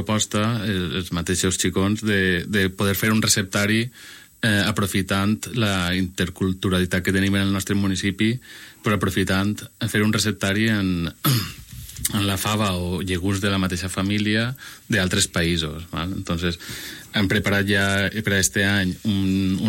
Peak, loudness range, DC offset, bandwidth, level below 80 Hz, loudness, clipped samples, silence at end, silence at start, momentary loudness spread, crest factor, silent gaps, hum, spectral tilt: -4 dBFS; 2 LU; under 0.1%; 16.5 kHz; -46 dBFS; -22 LUFS; under 0.1%; 0 s; 0 s; 8 LU; 18 dB; none; none; -4 dB/octave